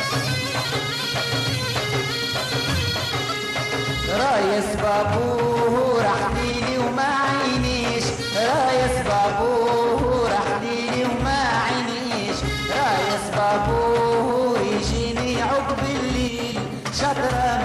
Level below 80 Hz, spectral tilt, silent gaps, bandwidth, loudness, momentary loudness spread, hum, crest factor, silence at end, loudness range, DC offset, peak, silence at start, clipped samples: -38 dBFS; -4.5 dB/octave; none; 14 kHz; -21 LUFS; 4 LU; none; 12 dB; 0 s; 2 LU; under 0.1%; -10 dBFS; 0 s; under 0.1%